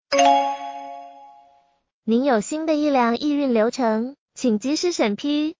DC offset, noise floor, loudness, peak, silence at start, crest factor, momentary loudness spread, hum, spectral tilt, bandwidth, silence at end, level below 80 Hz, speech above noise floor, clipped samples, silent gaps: under 0.1%; -58 dBFS; -21 LUFS; -4 dBFS; 0.1 s; 18 dB; 15 LU; none; -4 dB/octave; 7.6 kHz; 0.05 s; -66 dBFS; 38 dB; under 0.1%; 1.93-2.03 s, 4.18-4.26 s